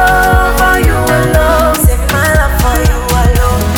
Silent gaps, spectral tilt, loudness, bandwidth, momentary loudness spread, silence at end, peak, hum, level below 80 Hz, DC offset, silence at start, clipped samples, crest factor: none; -5 dB/octave; -10 LUFS; 19 kHz; 3 LU; 0 s; 0 dBFS; none; -12 dBFS; under 0.1%; 0 s; under 0.1%; 8 dB